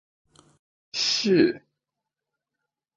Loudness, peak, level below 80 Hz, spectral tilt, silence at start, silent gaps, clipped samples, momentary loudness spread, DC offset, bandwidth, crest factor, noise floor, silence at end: -23 LUFS; -6 dBFS; -70 dBFS; -4 dB/octave; 0.95 s; none; under 0.1%; 14 LU; under 0.1%; 9.2 kHz; 22 dB; -86 dBFS; 1.4 s